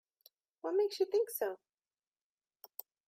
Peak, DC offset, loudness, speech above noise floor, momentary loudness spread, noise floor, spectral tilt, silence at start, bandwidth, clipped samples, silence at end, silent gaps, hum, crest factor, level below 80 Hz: -22 dBFS; under 0.1%; -35 LUFS; over 56 dB; 18 LU; under -90 dBFS; -2 dB/octave; 0.65 s; 16 kHz; under 0.1%; 1.55 s; none; none; 18 dB; under -90 dBFS